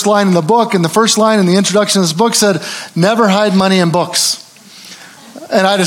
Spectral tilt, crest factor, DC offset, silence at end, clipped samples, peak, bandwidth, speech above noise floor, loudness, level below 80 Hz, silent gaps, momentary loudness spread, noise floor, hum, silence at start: -4 dB/octave; 12 dB; under 0.1%; 0 s; under 0.1%; 0 dBFS; 17 kHz; 25 dB; -11 LUFS; -60 dBFS; none; 7 LU; -36 dBFS; none; 0 s